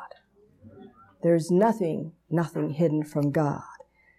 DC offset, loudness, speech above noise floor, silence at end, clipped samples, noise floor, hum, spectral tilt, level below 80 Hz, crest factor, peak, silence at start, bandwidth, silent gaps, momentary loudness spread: under 0.1%; -26 LUFS; 35 dB; 0.45 s; under 0.1%; -60 dBFS; none; -8 dB/octave; -68 dBFS; 16 dB; -12 dBFS; 0 s; 14 kHz; none; 13 LU